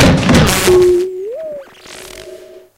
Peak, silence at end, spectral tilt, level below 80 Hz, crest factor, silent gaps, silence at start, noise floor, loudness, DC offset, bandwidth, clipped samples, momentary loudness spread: 0 dBFS; 0.2 s; -5 dB/octave; -28 dBFS; 12 dB; none; 0 s; -35 dBFS; -11 LUFS; under 0.1%; 16.5 kHz; under 0.1%; 23 LU